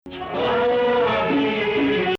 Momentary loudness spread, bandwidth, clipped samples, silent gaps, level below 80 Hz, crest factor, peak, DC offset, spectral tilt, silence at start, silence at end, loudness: 4 LU; 6.6 kHz; under 0.1%; none; -50 dBFS; 10 dB; -10 dBFS; under 0.1%; -7 dB/octave; 0.05 s; 0 s; -20 LUFS